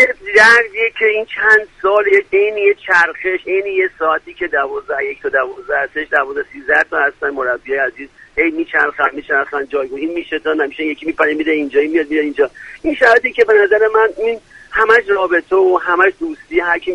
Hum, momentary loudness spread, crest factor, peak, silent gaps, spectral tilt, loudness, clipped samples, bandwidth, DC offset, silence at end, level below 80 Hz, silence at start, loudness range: none; 10 LU; 14 dB; 0 dBFS; none; -3.5 dB/octave; -14 LUFS; under 0.1%; 11.5 kHz; under 0.1%; 0 s; -50 dBFS; 0 s; 5 LU